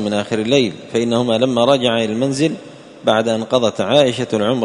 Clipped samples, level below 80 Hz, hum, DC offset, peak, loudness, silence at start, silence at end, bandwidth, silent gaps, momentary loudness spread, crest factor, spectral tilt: under 0.1%; -56 dBFS; none; under 0.1%; 0 dBFS; -16 LUFS; 0 s; 0 s; 11 kHz; none; 6 LU; 16 dB; -5 dB/octave